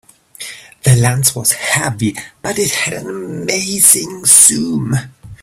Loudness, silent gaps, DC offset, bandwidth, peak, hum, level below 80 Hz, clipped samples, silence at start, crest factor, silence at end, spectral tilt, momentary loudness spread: -12 LUFS; none; under 0.1%; over 20 kHz; 0 dBFS; none; -44 dBFS; 0.3%; 0.4 s; 14 dB; 0.05 s; -3 dB/octave; 18 LU